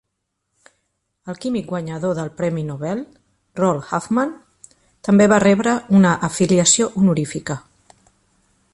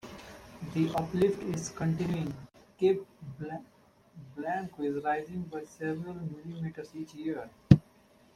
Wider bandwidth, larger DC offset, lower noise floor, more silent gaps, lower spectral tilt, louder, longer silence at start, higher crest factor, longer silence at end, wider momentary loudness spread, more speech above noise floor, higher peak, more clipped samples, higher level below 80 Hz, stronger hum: second, 11.5 kHz vs 14.5 kHz; neither; first, -76 dBFS vs -61 dBFS; neither; second, -5 dB/octave vs -7.5 dB/octave; first, -18 LUFS vs -32 LUFS; first, 1.25 s vs 0.05 s; second, 18 dB vs 30 dB; first, 1.15 s vs 0.55 s; about the same, 16 LU vs 18 LU; first, 58 dB vs 30 dB; about the same, -2 dBFS vs -4 dBFS; neither; about the same, -54 dBFS vs -54 dBFS; neither